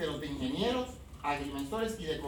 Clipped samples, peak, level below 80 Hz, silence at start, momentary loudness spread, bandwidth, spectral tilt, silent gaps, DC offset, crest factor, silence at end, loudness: under 0.1%; -20 dBFS; -50 dBFS; 0 s; 5 LU; over 20 kHz; -5 dB/octave; none; under 0.1%; 16 dB; 0 s; -35 LUFS